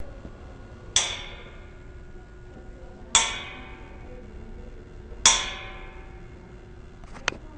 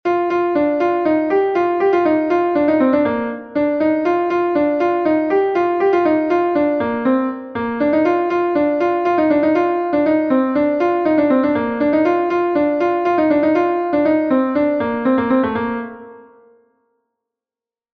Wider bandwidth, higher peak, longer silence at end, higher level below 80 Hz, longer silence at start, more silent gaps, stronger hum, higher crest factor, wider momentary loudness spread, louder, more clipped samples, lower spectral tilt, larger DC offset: first, 10 kHz vs 6.2 kHz; about the same, 0 dBFS vs -2 dBFS; second, 0 s vs 1.75 s; first, -44 dBFS vs -54 dBFS; about the same, 0 s vs 0.05 s; neither; neither; first, 32 dB vs 14 dB; first, 26 LU vs 4 LU; second, -23 LUFS vs -17 LUFS; neither; second, 0 dB/octave vs -8 dB/octave; neither